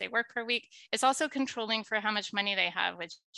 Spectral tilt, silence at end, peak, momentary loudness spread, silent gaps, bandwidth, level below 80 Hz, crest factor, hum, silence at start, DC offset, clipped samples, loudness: -2 dB/octave; 0 s; -12 dBFS; 5 LU; 3.24-3.33 s; 12.5 kHz; -82 dBFS; 20 dB; none; 0 s; under 0.1%; under 0.1%; -31 LUFS